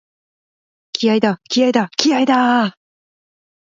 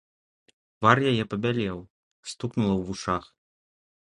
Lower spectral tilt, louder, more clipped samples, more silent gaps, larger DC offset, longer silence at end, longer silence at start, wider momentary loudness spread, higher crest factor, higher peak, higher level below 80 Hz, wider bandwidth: second, -4 dB/octave vs -6 dB/octave; first, -16 LUFS vs -26 LUFS; neither; second, none vs 1.90-2.23 s; neither; first, 1.1 s vs 0.9 s; first, 0.95 s vs 0.8 s; second, 6 LU vs 17 LU; second, 18 dB vs 26 dB; about the same, 0 dBFS vs -2 dBFS; second, -66 dBFS vs -54 dBFS; second, 7.6 kHz vs 11 kHz